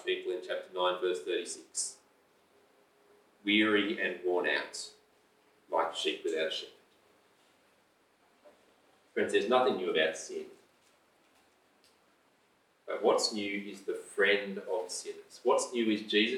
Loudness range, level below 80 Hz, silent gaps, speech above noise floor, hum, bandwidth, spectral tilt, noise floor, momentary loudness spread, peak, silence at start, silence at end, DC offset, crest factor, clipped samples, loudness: 6 LU; -88 dBFS; none; 38 dB; none; 14 kHz; -2.5 dB/octave; -70 dBFS; 12 LU; -12 dBFS; 0 s; 0 s; under 0.1%; 22 dB; under 0.1%; -32 LUFS